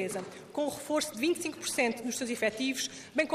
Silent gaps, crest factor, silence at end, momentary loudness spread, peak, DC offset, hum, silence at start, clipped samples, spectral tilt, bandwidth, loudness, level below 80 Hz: none; 18 dB; 0 s; 5 LU; -14 dBFS; under 0.1%; none; 0 s; under 0.1%; -2.5 dB/octave; 15.5 kHz; -32 LUFS; -72 dBFS